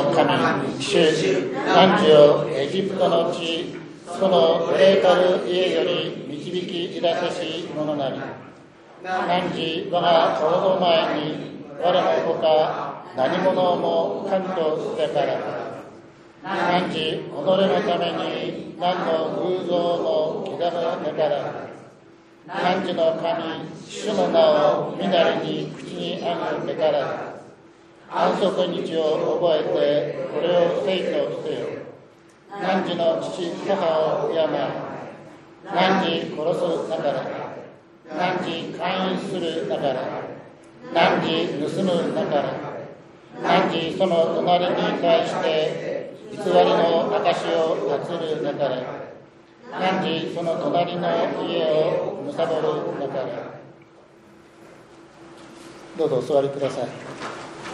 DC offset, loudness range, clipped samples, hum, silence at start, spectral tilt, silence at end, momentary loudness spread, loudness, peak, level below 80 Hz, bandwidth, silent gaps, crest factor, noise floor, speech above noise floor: under 0.1%; 6 LU; under 0.1%; none; 0 s; -5.5 dB/octave; 0 s; 14 LU; -22 LUFS; -2 dBFS; -68 dBFS; 11 kHz; none; 22 dB; -50 dBFS; 28 dB